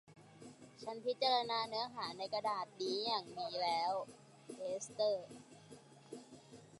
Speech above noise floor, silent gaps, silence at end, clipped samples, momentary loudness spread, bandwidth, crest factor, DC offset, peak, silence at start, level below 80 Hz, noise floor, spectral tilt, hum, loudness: 20 dB; none; 0 s; under 0.1%; 23 LU; 11.5 kHz; 20 dB; under 0.1%; -20 dBFS; 0.1 s; -86 dBFS; -59 dBFS; -3 dB/octave; none; -39 LUFS